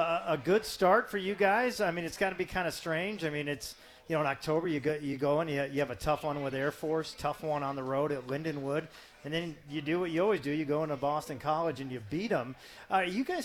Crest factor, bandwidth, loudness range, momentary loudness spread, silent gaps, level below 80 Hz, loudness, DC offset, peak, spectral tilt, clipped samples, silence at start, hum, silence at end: 20 dB; 18.5 kHz; 4 LU; 9 LU; none; -60 dBFS; -32 LUFS; under 0.1%; -12 dBFS; -5.5 dB/octave; under 0.1%; 0 s; none; 0 s